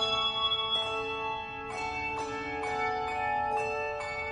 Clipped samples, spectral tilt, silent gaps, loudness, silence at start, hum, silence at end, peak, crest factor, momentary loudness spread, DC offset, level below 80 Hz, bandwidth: under 0.1%; -3 dB/octave; none; -31 LUFS; 0 s; none; 0 s; -16 dBFS; 16 dB; 8 LU; under 0.1%; -56 dBFS; 11.5 kHz